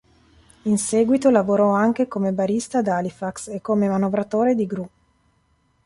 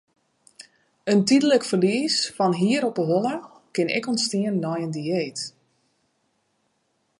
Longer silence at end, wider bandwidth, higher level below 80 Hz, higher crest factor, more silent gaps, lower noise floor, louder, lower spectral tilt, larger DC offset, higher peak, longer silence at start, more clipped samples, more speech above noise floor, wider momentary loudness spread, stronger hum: second, 1 s vs 1.7 s; about the same, 11.5 kHz vs 11.5 kHz; first, -60 dBFS vs -74 dBFS; about the same, 18 dB vs 18 dB; neither; second, -64 dBFS vs -71 dBFS; about the same, -21 LUFS vs -23 LUFS; first, -6 dB/octave vs -4.5 dB/octave; neither; first, -4 dBFS vs -8 dBFS; about the same, 0.65 s vs 0.6 s; neither; second, 44 dB vs 49 dB; about the same, 12 LU vs 12 LU; neither